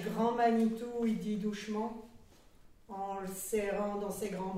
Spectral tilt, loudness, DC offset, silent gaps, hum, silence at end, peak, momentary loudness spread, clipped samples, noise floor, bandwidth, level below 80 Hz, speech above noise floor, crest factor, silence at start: -5.5 dB/octave; -35 LUFS; under 0.1%; none; none; 0 s; -18 dBFS; 12 LU; under 0.1%; -59 dBFS; 16 kHz; -62 dBFS; 25 dB; 18 dB; 0 s